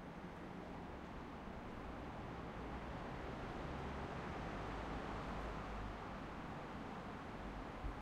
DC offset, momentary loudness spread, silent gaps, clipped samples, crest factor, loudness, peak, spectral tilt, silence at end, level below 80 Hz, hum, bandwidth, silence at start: under 0.1%; 5 LU; none; under 0.1%; 14 dB; -49 LUFS; -32 dBFS; -6.5 dB/octave; 0 s; -54 dBFS; none; 14 kHz; 0 s